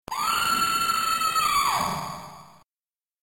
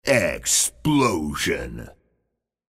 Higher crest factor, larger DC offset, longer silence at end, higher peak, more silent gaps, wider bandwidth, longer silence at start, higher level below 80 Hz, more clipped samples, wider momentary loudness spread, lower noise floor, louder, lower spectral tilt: second, 12 dB vs 20 dB; first, 0.1% vs under 0.1%; about the same, 0.8 s vs 0.8 s; second, -14 dBFS vs -4 dBFS; neither; about the same, 17 kHz vs 16 kHz; about the same, 0.1 s vs 0.05 s; second, -56 dBFS vs -44 dBFS; neither; about the same, 14 LU vs 12 LU; first, under -90 dBFS vs -77 dBFS; about the same, -23 LUFS vs -21 LUFS; second, -1 dB/octave vs -3 dB/octave